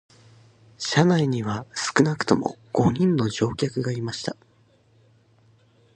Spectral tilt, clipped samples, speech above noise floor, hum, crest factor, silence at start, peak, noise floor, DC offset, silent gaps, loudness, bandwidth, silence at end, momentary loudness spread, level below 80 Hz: -5.5 dB/octave; under 0.1%; 37 dB; none; 22 dB; 0.8 s; -2 dBFS; -60 dBFS; under 0.1%; none; -23 LUFS; 9.8 kHz; 1.65 s; 10 LU; -54 dBFS